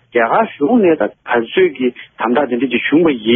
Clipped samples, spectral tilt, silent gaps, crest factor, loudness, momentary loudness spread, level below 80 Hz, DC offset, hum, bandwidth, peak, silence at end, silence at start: under 0.1%; -3.5 dB/octave; none; 14 dB; -15 LUFS; 6 LU; -56 dBFS; under 0.1%; none; 3.8 kHz; 0 dBFS; 0 s; 0.15 s